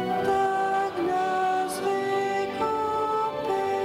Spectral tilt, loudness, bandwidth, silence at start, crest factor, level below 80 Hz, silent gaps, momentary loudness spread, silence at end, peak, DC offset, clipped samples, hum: -4.5 dB/octave; -26 LUFS; 16 kHz; 0 s; 12 dB; -62 dBFS; none; 3 LU; 0 s; -14 dBFS; under 0.1%; under 0.1%; none